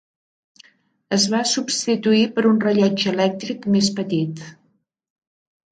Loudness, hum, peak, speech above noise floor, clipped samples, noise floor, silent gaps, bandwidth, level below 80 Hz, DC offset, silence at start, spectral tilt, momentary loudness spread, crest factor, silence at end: -19 LUFS; none; -4 dBFS; 47 dB; under 0.1%; -66 dBFS; none; 9.4 kHz; -62 dBFS; under 0.1%; 1.1 s; -4.5 dB/octave; 7 LU; 16 dB; 1.2 s